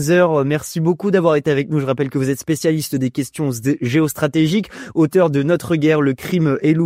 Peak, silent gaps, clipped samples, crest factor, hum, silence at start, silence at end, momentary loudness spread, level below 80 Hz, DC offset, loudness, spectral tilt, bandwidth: -2 dBFS; none; under 0.1%; 14 dB; none; 0 s; 0 s; 6 LU; -54 dBFS; under 0.1%; -17 LUFS; -6.5 dB/octave; 16 kHz